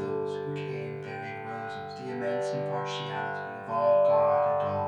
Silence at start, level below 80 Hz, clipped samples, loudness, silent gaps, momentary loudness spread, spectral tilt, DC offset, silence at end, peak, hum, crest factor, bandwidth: 0 s; -76 dBFS; under 0.1%; -29 LUFS; none; 14 LU; -6.5 dB/octave; under 0.1%; 0 s; -14 dBFS; none; 14 dB; 9.4 kHz